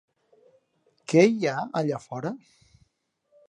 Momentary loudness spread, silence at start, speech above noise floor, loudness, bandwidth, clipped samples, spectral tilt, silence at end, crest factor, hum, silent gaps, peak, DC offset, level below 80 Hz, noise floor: 18 LU; 1.1 s; 50 dB; -25 LUFS; 10.5 kHz; under 0.1%; -6 dB/octave; 1.1 s; 22 dB; none; none; -6 dBFS; under 0.1%; -72 dBFS; -74 dBFS